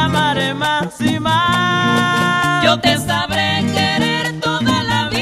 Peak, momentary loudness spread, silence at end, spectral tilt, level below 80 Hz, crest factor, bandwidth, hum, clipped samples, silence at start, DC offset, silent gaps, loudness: -2 dBFS; 4 LU; 0 s; -4.5 dB/octave; -44 dBFS; 14 dB; 15.5 kHz; none; under 0.1%; 0 s; under 0.1%; none; -15 LUFS